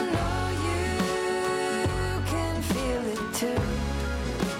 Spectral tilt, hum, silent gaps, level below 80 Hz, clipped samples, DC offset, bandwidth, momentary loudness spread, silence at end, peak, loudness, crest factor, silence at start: -5 dB/octave; none; none; -36 dBFS; under 0.1%; under 0.1%; 16.5 kHz; 3 LU; 0 s; -14 dBFS; -28 LUFS; 14 dB; 0 s